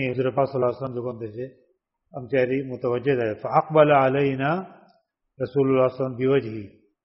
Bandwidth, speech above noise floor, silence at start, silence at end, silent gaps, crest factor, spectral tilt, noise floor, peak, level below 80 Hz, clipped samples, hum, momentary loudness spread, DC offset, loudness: 5.8 kHz; 42 dB; 0 s; 0.35 s; none; 20 dB; -6 dB/octave; -64 dBFS; -4 dBFS; -62 dBFS; under 0.1%; none; 17 LU; under 0.1%; -23 LUFS